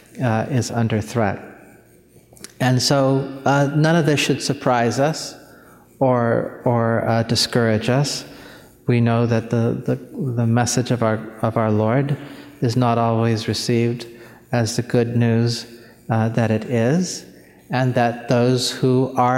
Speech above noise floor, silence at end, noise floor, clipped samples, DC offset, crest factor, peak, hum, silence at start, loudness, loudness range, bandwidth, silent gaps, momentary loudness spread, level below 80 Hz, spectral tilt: 32 dB; 0 s; -50 dBFS; under 0.1%; under 0.1%; 18 dB; -2 dBFS; none; 0.15 s; -19 LUFS; 2 LU; 15.5 kHz; none; 8 LU; -56 dBFS; -5.5 dB/octave